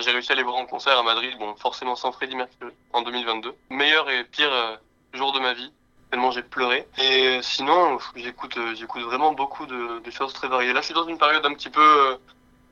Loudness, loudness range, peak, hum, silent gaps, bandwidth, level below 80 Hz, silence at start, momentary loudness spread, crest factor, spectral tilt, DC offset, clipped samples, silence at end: -22 LUFS; 4 LU; -4 dBFS; none; none; 10 kHz; -64 dBFS; 0 s; 13 LU; 20 dB; -2 dB/octave; under 0.1%; under 0.1%; 0.55 s